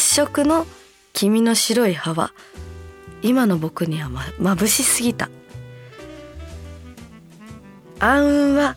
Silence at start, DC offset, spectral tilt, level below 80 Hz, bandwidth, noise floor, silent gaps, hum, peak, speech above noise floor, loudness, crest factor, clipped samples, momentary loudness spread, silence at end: 0 s; under 0.1%; -3.5 dB/octave; -42 dBFS; 18.5 kHz; -42 dBFS; none; none; -2 dBFS; 23 dB; -19 LUFS; 18 dB; under 0.1%; 23 LU; 0 s